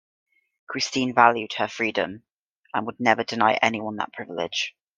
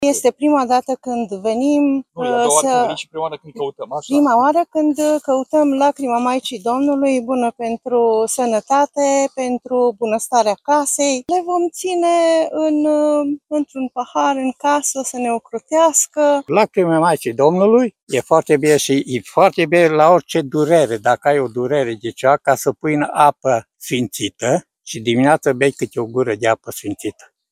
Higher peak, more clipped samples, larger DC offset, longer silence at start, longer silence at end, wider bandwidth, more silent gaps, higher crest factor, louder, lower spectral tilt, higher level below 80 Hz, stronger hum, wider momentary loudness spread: about the same, 0 dBFS vs 0 dBFS; neither; neither; first, 0.7 s vs 0 s; about the same, 0.3 s vs 0.4 s; second, 9.8 kHz vs 15.5 kHz; first, 2.33-2.63 s vs 18.03-18.07 s; first, 24 dB vs 16 dB; second, -23 LUFS vs -16 LUFS; about the same, -3.5 dB/octave vs -4.5 dB/octave; second, -70 dBFS vs -62 dBFS; neither; first, 13 LU vs 9 LU